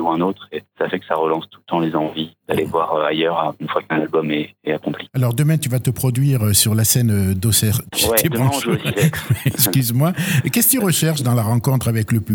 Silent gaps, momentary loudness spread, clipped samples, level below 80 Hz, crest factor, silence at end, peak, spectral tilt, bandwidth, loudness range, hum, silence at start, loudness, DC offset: none; 9 LU; under 0.1%; -48 dBFS; 18 dB; 0 s; 0 dBFS; -4.5 dB/octave; over 20 kHz; 4 LU; none; 0 s; -18 LUFS; under 0.1%